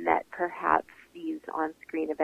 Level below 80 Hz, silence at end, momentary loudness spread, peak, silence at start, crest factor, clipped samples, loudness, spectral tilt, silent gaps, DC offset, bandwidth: -64 dBFS; 0 s; 11 LU; -8 dBFS; 0 s; 22 dB; under 0.1%; -31 LUFS; -6.5 dB/octave; none; under 0.1%; 14.5 kHz